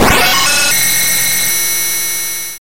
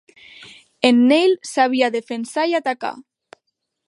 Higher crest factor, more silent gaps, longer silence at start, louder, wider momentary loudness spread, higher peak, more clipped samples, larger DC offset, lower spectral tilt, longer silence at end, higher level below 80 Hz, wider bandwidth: about the same, 14 dB vs 18 dB; neither; second, 0 s vs 0.4 s; first, -10 LUFS vs -18 LUFS; second, 6 LU vs 12 LU; about the same, 0 dBFS vs 0 dBFS; neither; first, 7% vs under 0.1%; second, -0.5 dB/octave vs -3.5 dB/octave; second, 0 s vs 0.85 s; first, -32 dBFS vs -74 dBFS; first, 16.5 kHz vs 11.5 kHz